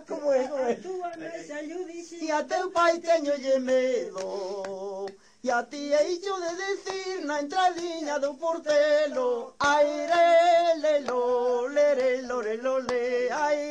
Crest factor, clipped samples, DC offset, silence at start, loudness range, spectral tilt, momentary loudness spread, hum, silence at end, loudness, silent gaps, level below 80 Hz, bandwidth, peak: 14 dB; under 0.1%; under 0.1%; 0 s; 6 LU; -2.5 dB/octave; 12 LU; none; 0 s; -26 LUFS; none; -70 dBFS; 9.8 kHz; -12 dBFS